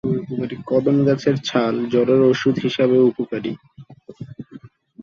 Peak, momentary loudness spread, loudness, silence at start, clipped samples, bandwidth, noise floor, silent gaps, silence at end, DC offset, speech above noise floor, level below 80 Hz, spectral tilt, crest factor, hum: -4 dBFS; 21 LU; -19 LUFS; 0.05 s; under 0.1%; 7.2 kHz; -43 dBFS; none; 0.35 s; under 0.1%; 25 dB; -58 dBFS; -7 dB/octave; 16 dB; none